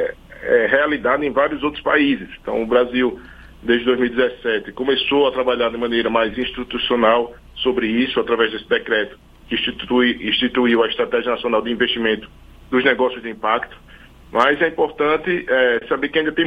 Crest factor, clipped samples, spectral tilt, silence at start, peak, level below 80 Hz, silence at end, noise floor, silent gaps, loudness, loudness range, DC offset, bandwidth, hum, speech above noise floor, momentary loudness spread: 18 dB; under 0.1%; -6 dB/octave; 0 s; 0 dBFS; -46 dBFS; 0 s; -43 dBFS; none; -19 LUFS; 1 LU; under 0.1%; 6.4 kHz; none; 25 dB; 8 LU